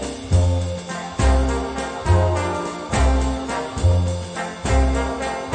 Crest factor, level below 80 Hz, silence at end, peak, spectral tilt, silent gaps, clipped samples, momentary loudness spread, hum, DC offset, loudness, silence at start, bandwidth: 16 dB; -24 dBFS; 0 s; -4 dBFS; -6 dB/octave; none; under 0.1%; 8 LU; none; under 0.1%; -21 LUFS; 0 s; 9.4 kHz